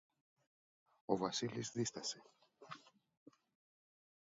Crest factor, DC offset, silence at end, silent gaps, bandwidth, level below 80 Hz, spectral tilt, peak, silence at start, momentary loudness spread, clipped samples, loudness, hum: 26 dB; under 0.1%; 1.45 s; none; 7.4 kHz; -82 dBFS; -4.5 dB/octave; -20 dBFS; 1.1 s; 18 LU; under 0.1%; -42 LUFS; none